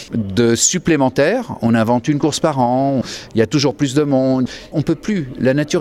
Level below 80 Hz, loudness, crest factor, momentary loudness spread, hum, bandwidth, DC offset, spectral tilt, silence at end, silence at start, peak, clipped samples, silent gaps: -46 dBFS; -16 LUFS; 16 dB; 7 LU; none; 14 kHz; under 0.1%; -5 dB/octave; 0 s; 0 s; 0 dBFS; under 0.1%; none